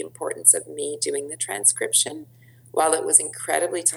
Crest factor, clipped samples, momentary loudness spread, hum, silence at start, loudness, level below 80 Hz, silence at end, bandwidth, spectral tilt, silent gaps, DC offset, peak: 22 dB; under 0.1%; 13 LU; none; 0 s; -20 LUFS; -76 dBFS; 0 s; over 20 kHz; -0.5 dB/octave; none; under 0.1%; 0 dBFS